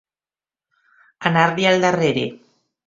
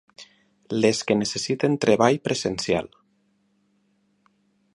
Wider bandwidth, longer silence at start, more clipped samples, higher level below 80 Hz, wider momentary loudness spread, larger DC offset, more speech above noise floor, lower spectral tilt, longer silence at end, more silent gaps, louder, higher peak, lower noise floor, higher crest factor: second, 7.8 kHz vs 11.5 kHz; first, 1.2 s vs 0.2 s; neither; about the same, -60 dBFS vs -58 dBFS; about the same, 9 LU vs 7 LU; neither; first, over 73 dB vs 45 dB; about the same, -5 dB/octave vs -4.5 dB/octave; second, 0.5 s vs 1.9 s; neither; first, -18 LUFS vs -23 LUFS; about the same, 0 dBFS vs -2 dBFS; first, under -90 dBFS vs -67 dBFS; about the same, 20 dB vs 24 dB